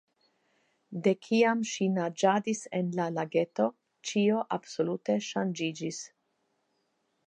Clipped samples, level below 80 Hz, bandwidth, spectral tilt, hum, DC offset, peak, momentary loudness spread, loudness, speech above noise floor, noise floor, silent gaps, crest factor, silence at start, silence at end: under 0.1%; -84 dBFS; 9.6 kHz; -5 dB/octave; none; under 0.1%; -10 dBFS; 10 LU; -30 LUFS; 47 dB; -76 dBFS; none; 20 dB; 0.9 s; 1.2 s